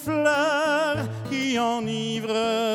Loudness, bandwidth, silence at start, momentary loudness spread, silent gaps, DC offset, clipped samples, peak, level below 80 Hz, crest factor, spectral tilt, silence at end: -24 LUFS; 17 kHz; 0 s; 6 LU; none; under 0.1%; under 0.1%; -8 dBFS; -60 dBFS; 16 dB; -4.5 dB/octave; 0 s